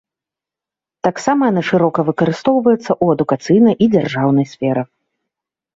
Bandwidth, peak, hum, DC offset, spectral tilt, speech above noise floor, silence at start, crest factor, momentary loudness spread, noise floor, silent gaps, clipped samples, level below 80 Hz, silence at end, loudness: 7.8 kHz; 0 dBFS; none; under 0.1%; -7 dB/octave; 73 dB; 1.05 s; 14 dB; 7 LU; -87 dBFS; none; under 0.1%; -56 dBFS; 0.9 s; -15 LUFS